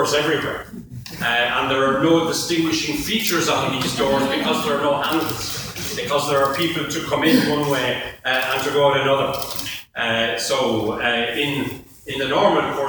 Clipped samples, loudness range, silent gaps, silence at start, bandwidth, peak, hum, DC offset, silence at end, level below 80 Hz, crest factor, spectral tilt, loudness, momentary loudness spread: under 0.1%; 2 LU; none; 0 s; over 20 kHz; -2 dBFS; none; under 0.1%; 0 s; -50 dBFS; 18 dB; -3.5 dB/octave; -20 LUFS; 9 LU